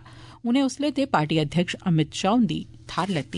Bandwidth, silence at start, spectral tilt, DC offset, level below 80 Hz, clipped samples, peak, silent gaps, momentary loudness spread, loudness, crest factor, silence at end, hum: 11 kHz; 0.05 s; -6 dB/octave; under 0.1%; -54 dBFS; under 0.1%; -6 dBFS; none; 8 LU; -24 LUFS; 18 dB; 0 s; none